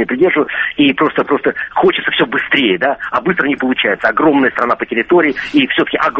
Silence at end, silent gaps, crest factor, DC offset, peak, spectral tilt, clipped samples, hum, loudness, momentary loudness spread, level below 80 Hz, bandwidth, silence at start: 0 s; none; 14 dB; under 0.1%; 0 dBFS; -6.5 dB/octave; under 0.1%; none; -13 LUFS; 4 LU; -50 dBFS; 6.8 kHz; 0 s